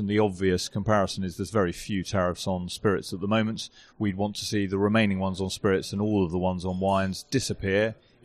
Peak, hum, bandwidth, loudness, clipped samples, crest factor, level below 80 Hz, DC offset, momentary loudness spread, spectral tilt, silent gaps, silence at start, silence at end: -10 dBFS; none; 14 kHz; -27 LUFS; under 0.1%; 16 dB; -52 dBFS; under 0.1%; 6 LU; -5.5 dB/octave; none; 0 s; 0.3 s